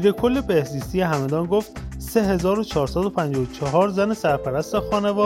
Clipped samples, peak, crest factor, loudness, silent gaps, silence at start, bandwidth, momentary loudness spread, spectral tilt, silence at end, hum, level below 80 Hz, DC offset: under 0.1%; -6 dBFS; 16 dB; -22 LUFS; none; 0 s; 16.5 kHz; 5 LU; -6.5 dB/octave; 0 s; none; -40 dBFS; under 0.1%